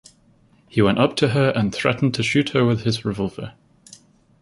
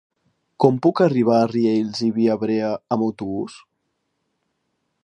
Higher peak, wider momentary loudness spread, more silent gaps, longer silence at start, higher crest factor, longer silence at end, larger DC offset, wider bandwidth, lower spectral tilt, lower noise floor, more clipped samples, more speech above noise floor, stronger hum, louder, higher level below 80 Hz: about the same, -2 dBFS vs -2 dBFS; about the same, 9 LU vs 10 LU; neither; first, 0.75 s vs 0.6 s; about the same, 20 dB vs 20 dB; second, 0.9 s vs 1.45 s; neither; first, 11.5 kHz vs 10 kHz; second, -6 dB/octave vs -7.5 dB/octave; second, -56 dBFS vs -74 dBFS; neither; second, 37 dB vs 55 dB; neither; about the same, -20 LUFS vs -20 LUFS; first, -50 dBFS vs -64 dBFS